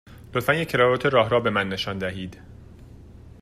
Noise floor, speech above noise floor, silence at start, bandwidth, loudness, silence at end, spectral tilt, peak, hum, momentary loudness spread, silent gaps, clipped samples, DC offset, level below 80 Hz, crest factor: -45 dBFS; 22 dB; 0.1 s; 15 kHz; -22 LUFS; 0.1 s; -5.5 dB/octave; -6 dBFS; none; 11 LU; none; under 0.1%; under 0.1%; -50 dBFS; 18 dB